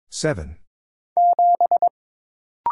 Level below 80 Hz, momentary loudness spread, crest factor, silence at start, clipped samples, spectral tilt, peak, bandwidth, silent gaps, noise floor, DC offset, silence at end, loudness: -46 dBFS; 13 LU; 12 dB; 0.15 s; under 0.1%; -5 dB/octave; -8 dBFS; 11.5 kHz; 0.67-1.16 s, 1.90-2.64 s; under -90 dBFS; under 0.1%; 0 s; -19 LUFS